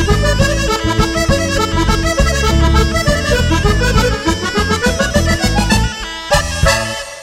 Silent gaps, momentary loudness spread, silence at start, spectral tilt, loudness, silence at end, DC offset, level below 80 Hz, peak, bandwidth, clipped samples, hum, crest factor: none; 3 LU; 0 s; -4.5 dB/octave; -14 LUFS; 0 s; under 0.1%; -18 dBFS; 0 dBFS; 16 kHz; under 0.1%; none; 14 dB